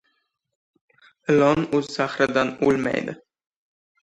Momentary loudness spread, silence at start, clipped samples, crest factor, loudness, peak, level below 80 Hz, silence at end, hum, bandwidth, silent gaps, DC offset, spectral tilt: 14 LU; 1.3 s; under 0.1%; 20 dB; -21 LUFS; -4 dBFS; -58 dBFS; 0.9 s; none; 9.4 kHz; none; under 0.1%; -6 dB/octave